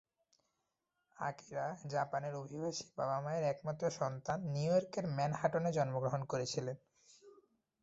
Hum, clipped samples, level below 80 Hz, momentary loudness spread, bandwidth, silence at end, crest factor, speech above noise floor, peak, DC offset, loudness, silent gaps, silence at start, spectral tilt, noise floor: none; under 0.1%; -74 dBFS; 8 LU; 8 kHz; 0.5 s; 22 dB; 49 dB; -18 dBFS; under 0.1%; -38 LUFS; none; 1.2 s; -6 dB/octave; -86 dBFS